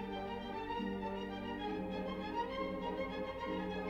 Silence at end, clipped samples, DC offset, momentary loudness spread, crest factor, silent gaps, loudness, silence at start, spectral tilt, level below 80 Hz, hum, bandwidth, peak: 0 s; under 0.1%; under 0.1%; 3 LU; 14 dB; none; -41 LUFS; 0 s; -7 dB/octave; -58 dBFS; 50 Hz at -60 dBFS; 15.5 kHz; -28 dBFS